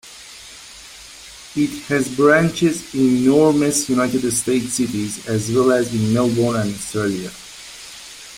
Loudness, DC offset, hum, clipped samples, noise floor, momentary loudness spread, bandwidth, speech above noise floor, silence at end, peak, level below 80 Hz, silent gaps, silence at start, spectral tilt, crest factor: -18 LUFS; under 0.1%; none; under 0.1%; -39 dBFS; 22 LU; 16.5 kHz; 22 dB; 0 s; -2 dBFS; -52 dBFS; none; 0.05 s; -5 dB/octave; 18 dB